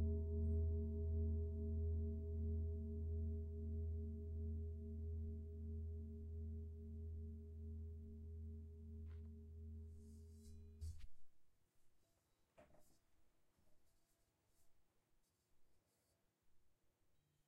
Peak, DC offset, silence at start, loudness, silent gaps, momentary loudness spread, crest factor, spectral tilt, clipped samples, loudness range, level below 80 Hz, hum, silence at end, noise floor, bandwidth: -34 dBFS; under 0.1%; 0 s; -49 LUFS; none; 14 LU; 14 dB; -10.5 dB/octave; under 0.1%; 16 LU; -54 dBFS; none; 0.8 s; -84 dBFS; 1 kHz